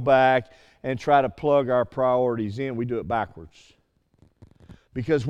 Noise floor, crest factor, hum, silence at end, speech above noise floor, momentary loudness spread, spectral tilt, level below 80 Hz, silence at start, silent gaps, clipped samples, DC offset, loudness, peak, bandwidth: -61 dBFS; 18 dB; none; 0 s; 38 dB; 13 LU; -7.5 dB/octave; -54 dBFS; 0 s; none; under 0.1%; under 0.1%; -23 LUFS; -6 dBFS; 8.8 kHz